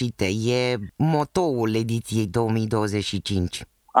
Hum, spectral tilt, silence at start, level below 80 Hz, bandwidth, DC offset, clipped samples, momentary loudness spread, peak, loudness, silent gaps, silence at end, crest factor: none; -6 dB/octave; 0 s; -50 dBFS; 16 kHz; under 0.1%; under 0.1%; 4 LU; -2 dBFS; -24 LUFS; none; 0 s; 22 dB